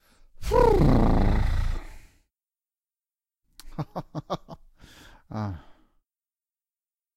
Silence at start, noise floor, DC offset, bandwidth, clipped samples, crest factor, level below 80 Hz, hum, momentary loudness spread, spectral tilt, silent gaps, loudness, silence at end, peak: 0.4 s; under -90 dBFS; under 0.1%; 13 kHz; under 0.1%; 22 dB; -30 dBFS; none; 19 LU; -8 dB/octave; none; -26 LUFS; 1.6 s; -6 dBFS